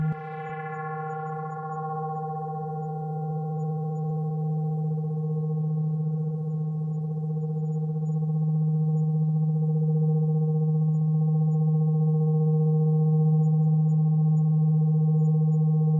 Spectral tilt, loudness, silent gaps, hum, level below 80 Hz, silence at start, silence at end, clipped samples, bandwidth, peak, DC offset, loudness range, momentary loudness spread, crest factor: -12.5 dB/octave; -25 LUFS; none; none; -68 dBFS; 0 s; 0 s; under 0.1%; 2.4 kHz; -16 dBFS; under 0.1%; 9 LU; 10 LU; 8 dB